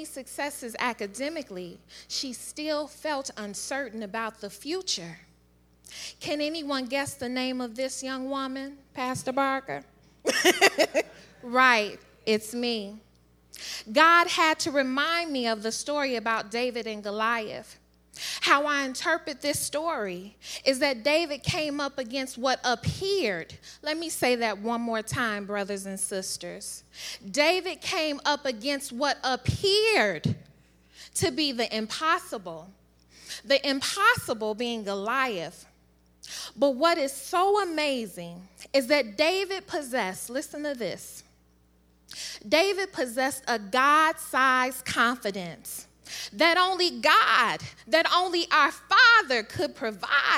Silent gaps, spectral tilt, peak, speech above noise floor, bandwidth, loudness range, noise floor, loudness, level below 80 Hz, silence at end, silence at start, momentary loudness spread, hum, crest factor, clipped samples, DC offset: none; -3 dB/octave; -4 dBFS; 35 dB; 17 kHz; 8 LU; -62 dBFS; -26 LUFS; -62 dBFS; 0 s; 0 s; 17 LU; none; 24 dB; under 0.1%; under 0.1%